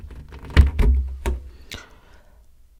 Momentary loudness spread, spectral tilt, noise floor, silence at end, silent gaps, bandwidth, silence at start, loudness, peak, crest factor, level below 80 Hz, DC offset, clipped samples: 20 LU; -6.5 dB/octave; -50 dBFS; 0.95 s; none; 10 kHz; 0.05 s; -22 LUFS; 0 dBFS; 22 dB; -22 dBFS; under 0.1%; under 0.1%